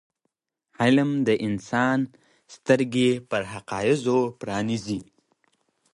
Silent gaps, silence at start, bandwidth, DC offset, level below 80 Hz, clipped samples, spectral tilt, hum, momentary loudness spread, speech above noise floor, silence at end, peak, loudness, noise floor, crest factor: none; 0.8 s; 11.5 kHz; under 0.1%; -60 dBFS; under 0.1%; -6 dB/octave; none; 11 LU; 55 dB; 0.9 s; -6 dBFS; -24 LUFS; -79 dBFS; 20 dB